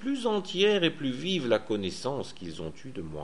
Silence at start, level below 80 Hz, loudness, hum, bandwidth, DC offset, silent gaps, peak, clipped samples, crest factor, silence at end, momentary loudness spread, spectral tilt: 0 s; -58 dBFS; -29 LUFS; none; 11.5 kHz; 0.6%; none; -10 dBFS; under 0.1%; 20 dB; 0 s; 15 LU; -5 dB/octave